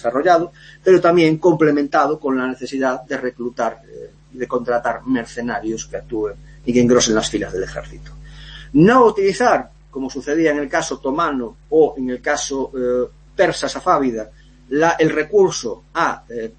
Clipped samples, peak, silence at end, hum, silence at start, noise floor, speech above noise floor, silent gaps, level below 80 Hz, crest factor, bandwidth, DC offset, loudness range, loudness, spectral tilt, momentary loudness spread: under 0.1%; -2 dBFS; 0.1 s; none; 0 s; -37 dBFS; 19 dB; none; -44 dBFS; 16 dB; 8.8 kHz; under 0.1%; 6 LU; -18 LUFS; -5 dB/octave; 14 LU